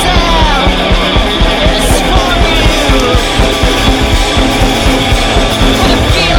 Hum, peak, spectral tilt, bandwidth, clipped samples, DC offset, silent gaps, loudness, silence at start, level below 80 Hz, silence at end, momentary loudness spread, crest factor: none; 0 dBFS; -4 dB/octave; 17.5 kHz; under 0.1%; under 0.1%; none; -9 LUFS; 0 s; -12 dBFS; 0 s; 1 LU; 8 dB